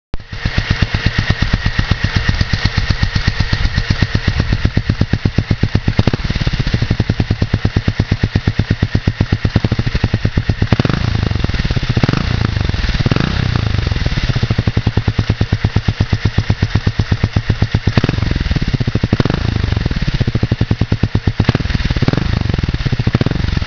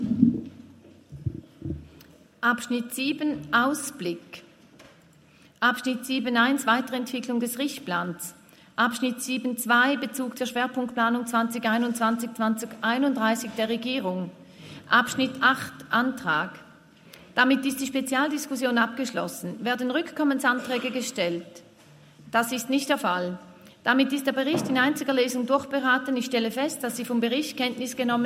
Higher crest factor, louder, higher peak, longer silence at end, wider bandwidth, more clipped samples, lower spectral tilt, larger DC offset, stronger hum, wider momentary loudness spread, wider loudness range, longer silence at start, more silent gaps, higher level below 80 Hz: second, 14 dB vs 22 dB; first, -16 LUFS vs -26 LUFS; first, 0 dBFS vs -6 dBFS; about the same, 0 s vs 0 s; second, 5.4 kHz vs 16 kHz; first, 0.4% vs under 0.1%; first, -6.5 dB/octave vs -3.5 dB/octave; neither; neither; second, 2 LU vs 11 LU; second, 0 LU vs 3 LU; first, 0.15 s vs 0 s; neither; first, -22 dBFS vs -62 dBFS